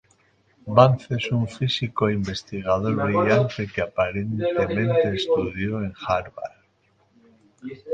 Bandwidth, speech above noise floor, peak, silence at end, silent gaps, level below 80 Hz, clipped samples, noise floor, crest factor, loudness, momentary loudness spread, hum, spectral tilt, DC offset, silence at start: 8.8 kHz; 41 dB; 0 dBFS; 0 s; none; -50 dBFS; under 0.1%; -64 dBFS; 22 dB; -23 LUFS; 15 LU; none; -7 dB/octave; under 0.1%; 0.65 s